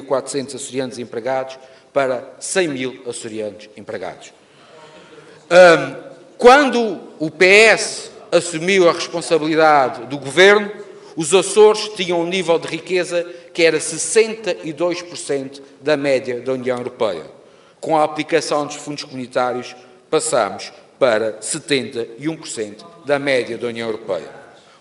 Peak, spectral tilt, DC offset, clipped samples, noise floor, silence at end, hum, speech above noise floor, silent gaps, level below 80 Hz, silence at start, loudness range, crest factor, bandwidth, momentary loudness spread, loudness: 0 dBFS; -3 dB/octave; under 0.1%; under 0.1%; -44 dBFS; 0.4 s; none; 27 dB; none; -62 dBFS; 0 s; 9 LU; 18 dB; 11.5 kHz; 18 LU; -17 LUFS